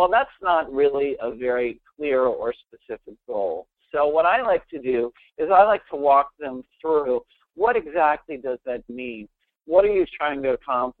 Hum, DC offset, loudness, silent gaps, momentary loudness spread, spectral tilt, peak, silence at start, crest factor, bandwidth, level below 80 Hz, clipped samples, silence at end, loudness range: none; under 0.1%; -22 LUFS; none; 15 LU; -8.5 dB/octave; -2 dBFS; 0 s; 20 dB; 4.4 kHz; -54 dBFS; under 0.1%; 0.1 s; 4 LU